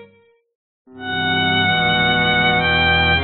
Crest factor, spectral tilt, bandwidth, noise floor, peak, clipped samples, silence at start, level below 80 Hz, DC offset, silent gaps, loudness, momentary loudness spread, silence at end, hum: 14 dB; -1.5 dB/octave; 4.5 kHz; -53 dBFS; -4 dBFS; under 0.1%; 0 s; -38 dBFS; under 0.1%; 0.55-0.85 s; -15 LUFS; 8 LU; 0 s; none